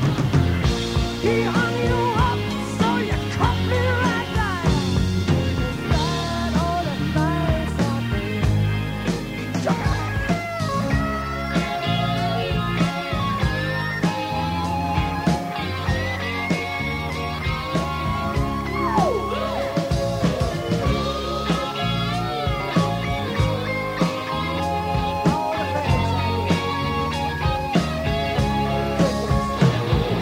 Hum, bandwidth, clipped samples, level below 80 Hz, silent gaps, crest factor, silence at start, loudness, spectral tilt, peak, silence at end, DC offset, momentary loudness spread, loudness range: none; 16 kHz; under 0.1%; -32 dBFS; none; 16 dB; 0 s; -22 LUFS; -6 dB/octave; -4 dBFS; 0 s; under 0.1%; 4 LU; 2 LU